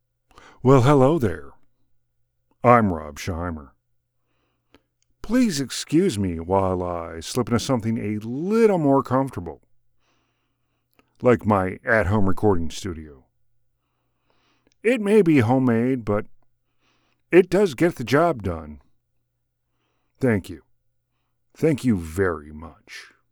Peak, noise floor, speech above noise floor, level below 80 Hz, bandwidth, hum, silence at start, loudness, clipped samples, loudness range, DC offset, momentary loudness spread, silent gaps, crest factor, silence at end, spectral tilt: -2 dBFS; -74 dBFS; 54 dB; -46 dBFS; 20 kHz; none; 0.65 s; -21 LUFS; under 0.1%; 6 LU; under 0.1%; 17 LU; none; 22 dB; 0.25 s; -6.5 dB/octave